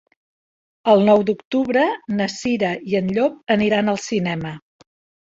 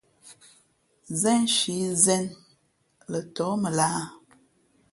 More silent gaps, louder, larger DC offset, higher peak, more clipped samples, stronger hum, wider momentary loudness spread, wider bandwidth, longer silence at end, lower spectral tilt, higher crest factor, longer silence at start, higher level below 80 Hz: first, 1.45-1.51 s, 3.43-3.47 s vs none; first, -19 LUFS vs -24 LUFS; neither; first, -2 dBFS vs -6 dBFS; neither; neither; second, 9 LU vs 13 LU; second, 8 kHz vs 12 kHz; second, 0.6 s vs 0.75 s; first, -6 dB/octave vs -3.5 dB/octave; about the same, 18 dB vs 22 dB; first, 0.85 s vs 0.25 s; first, -58 dBFS vs -68 dBFS